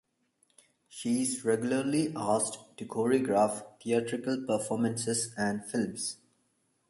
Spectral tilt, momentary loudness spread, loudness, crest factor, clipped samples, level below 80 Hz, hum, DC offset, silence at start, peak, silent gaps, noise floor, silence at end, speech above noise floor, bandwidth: -4.5 dB/octave; 10 LU; -31 LUFS; 18 dB; under 0.1%; -72 dBFS; none; under 0.1%; 0.9 s; -14 dBFS; none; -74 dBFS; 0.75 s; 44 dB; 12 kHz